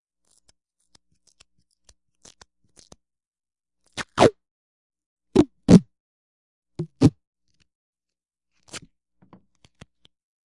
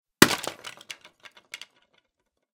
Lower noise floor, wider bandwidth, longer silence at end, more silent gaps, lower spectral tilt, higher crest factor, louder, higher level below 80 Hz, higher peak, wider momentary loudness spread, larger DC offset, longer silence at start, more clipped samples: first, -90 dBFS vs -78 dBFS; second, 11.5 kHz vs 18 kHz; first, 1.65 s vs 1 s; first, 4.51-4.90 s, 5.06-5.17 s, 6.00-6.62 s, 7.27-7.33 s, 7.75-7.93 s vs none; first, -7 dB/octave vs -2.5 dB/octave; about the same, 26 dB vs 28 dB; about the same, -20 LUFS vs -22 LUFS; first, -50 dBFS vs -62 dBFS; about the same, 0 dBFS vs 0 dBFS; about the same, 24 LU vs 23 LU; neither; first, 3.95 s vs 0.2 s; neither